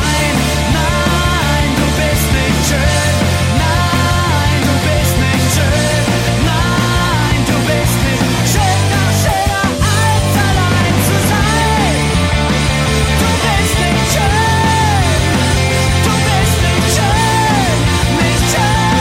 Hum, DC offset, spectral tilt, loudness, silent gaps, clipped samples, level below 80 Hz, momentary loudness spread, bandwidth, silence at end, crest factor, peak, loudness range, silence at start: none; under 0.1%; -4.5 dB/octave; -12 LUFS; none; under 0.1%; -22 dBFS; 1 LU; 16.5 kHz; 0 s; 10 dB; -2 dBFS; 1 LU; 0 s